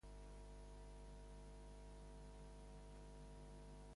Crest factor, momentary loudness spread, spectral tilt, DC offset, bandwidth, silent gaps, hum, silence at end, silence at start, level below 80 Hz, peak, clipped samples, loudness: 10 dB; 0 LU; -5.5 dB/octave; under 0.1%; 11.5 kHz; none; 50 Hz at -60 dBFS; 0 s; 0.05 s; -60 dBFS; -48 dBFS; under 0.1%; -60 LUFS